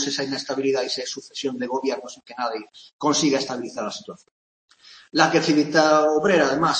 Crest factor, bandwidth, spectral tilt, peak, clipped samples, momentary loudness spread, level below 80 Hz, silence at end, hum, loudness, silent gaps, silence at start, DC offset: 20 dB; 8.8 kHz; -3.5 dB/octave; -2 dBFS; under 0.1%; 13 LU; -66 dBFS; 0 s; none; -22 LUFS; 2.93-2.99 s, 4.31-4.68 s; 0 s; under 0.1%